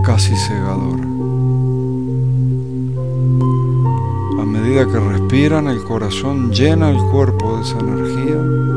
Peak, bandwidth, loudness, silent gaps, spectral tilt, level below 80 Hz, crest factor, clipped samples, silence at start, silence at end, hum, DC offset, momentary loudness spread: 0 dBFS; 10.5 kHz; -16 LUFS; none; -7 dB/octave; -38 dBFS; 14 dB; under 0.1%; 0 s; 0 s; none; 2%; 6 LU